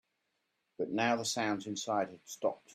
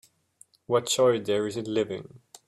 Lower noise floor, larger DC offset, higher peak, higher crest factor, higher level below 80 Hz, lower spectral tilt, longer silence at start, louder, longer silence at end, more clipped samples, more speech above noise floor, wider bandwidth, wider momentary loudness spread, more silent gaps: first, -82 dBFS vs -60 dBFS; neither; second, -16 dBFS vs -10 dBFS; about the same, 20 dB vs 16 dB; second, -80 dBFS vs -68 dBFS; about the same, -3.5 dB/octave vs -4 dB/octave; about the same, 0.8 s vs 0.7 s; second, -35 LUFS vs -26 LUFS; second, 0 s vs 0.3 s; neither; first, 47 dB vs 34 dB; about the same, 15.5 kHz vs 15.5 kHz; about the same, 7 LU vs 8 LU; neither